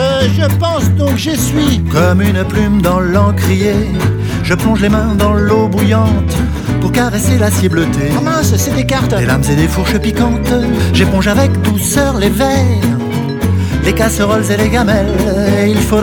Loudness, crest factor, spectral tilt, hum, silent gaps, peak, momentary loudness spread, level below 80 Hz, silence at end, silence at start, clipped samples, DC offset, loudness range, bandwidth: -12 LUFS; 10 dB; -6 dB/octave; none; none; 0 dBFS; 3 LU; -24 dBFS; 0 s; 0 s; under 0.1%; under 0.1%; 1 LU; 20 kHz